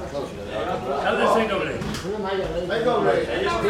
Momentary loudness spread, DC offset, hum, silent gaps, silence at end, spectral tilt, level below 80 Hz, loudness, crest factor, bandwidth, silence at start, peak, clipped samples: 9 LU; under 0.1%; none; none; 0 s; -5 dB/octave; -44 dBFS; -24 LUFS; 16 dB; 16 kHz; 0 s; -8 dBFS; under 0.1%